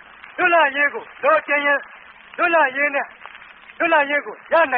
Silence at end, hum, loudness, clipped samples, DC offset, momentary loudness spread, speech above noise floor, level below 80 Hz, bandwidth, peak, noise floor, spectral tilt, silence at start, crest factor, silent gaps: 0 s; none; -18 LUFS; under 0.1%; under 0.1%; 17 LU; 24 dB; -68 dBFS; 4.3 kHz; -6 dBFS; -43 dBFS; 1 dB/octave; 0.25 s; 14 dB; none